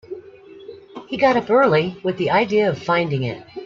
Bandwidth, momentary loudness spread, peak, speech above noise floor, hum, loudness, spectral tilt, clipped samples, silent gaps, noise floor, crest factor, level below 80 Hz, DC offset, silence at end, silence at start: 7.4 kHz; 21 LU; -4 dBFS; 23 dB; none; -19 LUFS; -7 dB/octave; under 0.1%; none; -42 dBFS; 16 dB; -58 dBFS; under 0.1%; 0 s; 0.1 s